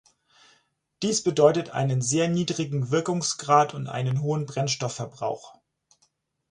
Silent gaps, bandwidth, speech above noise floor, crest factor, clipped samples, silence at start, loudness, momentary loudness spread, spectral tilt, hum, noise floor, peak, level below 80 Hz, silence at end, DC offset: none; 11 kHz; 45 dB; 20 dB; under 0.1%; 1 s; -25 LUFS; 11 LU; -5 dB/octave; none; -70 dBFS; -6 dBFS; -64 dBFS; 1 s; under 0.1%